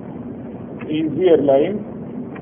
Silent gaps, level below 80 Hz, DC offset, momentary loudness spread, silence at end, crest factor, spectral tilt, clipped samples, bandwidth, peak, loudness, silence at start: none; -54 dBFS; under 0.1%; 17 LU; 0 s; 18 dB; -12 dB/octave; under 0.1%; 3.6 kHz; -2 dBFS; -17 LUFS; 0 s